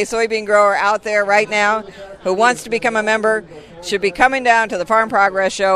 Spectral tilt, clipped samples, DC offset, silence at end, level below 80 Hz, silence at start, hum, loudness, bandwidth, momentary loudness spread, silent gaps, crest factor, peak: -3 dB/octave; under 0.1%; under 0.1%; 0 s; -50 dBFS; 0 s; none; -16 LUFS; 13.5 kHz; 9 LU; none; 16 dB; 0 dBFS